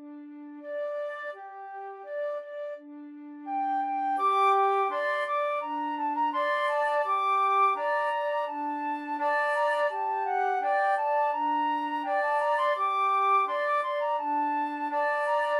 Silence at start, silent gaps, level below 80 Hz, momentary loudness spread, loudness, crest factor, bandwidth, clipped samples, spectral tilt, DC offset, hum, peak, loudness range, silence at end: 0 s; none; under -90 dBFS; 15 LU; -27 LUFS; 14 dB; 12 kHz; under 0.1%; -1.5 dB/octave; under 0.1%; none; -14 dBFS; 7 LU; 0 s